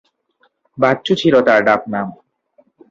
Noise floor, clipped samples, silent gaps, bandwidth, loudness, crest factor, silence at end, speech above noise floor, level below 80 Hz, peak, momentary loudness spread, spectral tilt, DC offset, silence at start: -61 dBFS; under 0.1%; none; 7.6 kHz; -15 LUFS; 16 dB; 0.75 s; 47 dB; -58 dBFS; -2 dBFS; 12 LU; -6 dB/octave; under 0.1%; 0.75 s